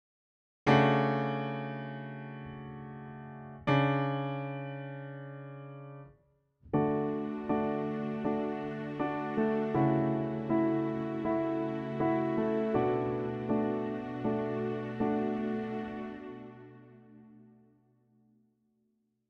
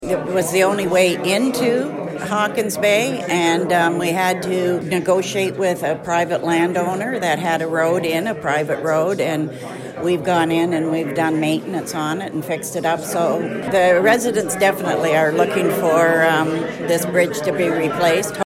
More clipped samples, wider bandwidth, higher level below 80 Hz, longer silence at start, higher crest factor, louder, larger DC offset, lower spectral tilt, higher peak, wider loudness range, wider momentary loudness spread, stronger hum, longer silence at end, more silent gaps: neither; second, 6.6 kHz vs 16 kHz; second, -64 dBFS vs -56 dBFS; first, 0.65 s vs 0 s; first, 22 dB vs 16 dB; second, -32 LUFS vs -18 LUFS; neither; first, -8.5 dB/octave vs -4.5 dB/octave; second, -12 dBFS vs -2 dBFS; first, 6 LU vs 3 LU; first, 17 LU vs 7 LU; neither; first, 1.85 s vs 0 s; neither